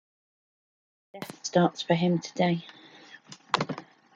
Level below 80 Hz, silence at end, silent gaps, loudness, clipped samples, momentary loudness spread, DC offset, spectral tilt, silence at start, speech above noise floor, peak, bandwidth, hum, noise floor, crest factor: -72 dBFS; 0.35 s; none; -28 LUFS; under 0.1%; 22 LU; under 0.1%; -5.5 dB/octave; 1.15 s; 26 dB; -6 dBFS; 11.5 kHz; none; -51 dBFS; 24 dB